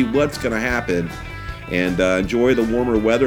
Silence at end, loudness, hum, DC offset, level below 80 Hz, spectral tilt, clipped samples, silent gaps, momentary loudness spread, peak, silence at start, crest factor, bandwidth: 0 s; -19 LUFS; none; under 0.1%; -36 dBFS; -6 dB/octave; under 0.1%; none; 12 LU; -4 dBFS; 0 s; 14 dB; 18.5 kHz